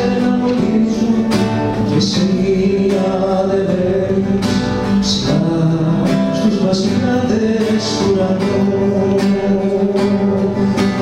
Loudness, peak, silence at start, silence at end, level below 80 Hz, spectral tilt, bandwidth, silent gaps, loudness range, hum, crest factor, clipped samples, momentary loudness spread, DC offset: -15 LUFS; -2 dBFS; 0 s; 0 s; -38 dBFS; -6.5 dB/octave; 11 kHz; none; 0 LU; none; 12 dB; under 0.1%; 1 LU; under 0.1%